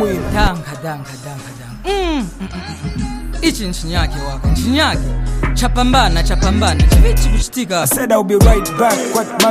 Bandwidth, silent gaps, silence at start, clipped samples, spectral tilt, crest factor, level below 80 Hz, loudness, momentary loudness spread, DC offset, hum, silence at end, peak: 15.5 kHz; none; 0 s; under 0.1%; -4.5 dB/octave; 14 dB; -18 dBFS; -15 LUFS; 14 LU; under 0.1%; none; 0 s; 0 dBFS